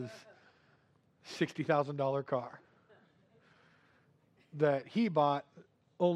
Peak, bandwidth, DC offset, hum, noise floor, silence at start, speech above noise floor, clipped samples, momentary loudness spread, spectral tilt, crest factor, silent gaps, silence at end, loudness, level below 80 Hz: -16 dBFS; 11.5 kHz; under 0.1%; none; -70 dBFS; 0 s; 37 dB; under 0.1%; 18 LU; -7 dB/octave; 20 dB; none; 0 s; -33 LUFS; -86 dBFS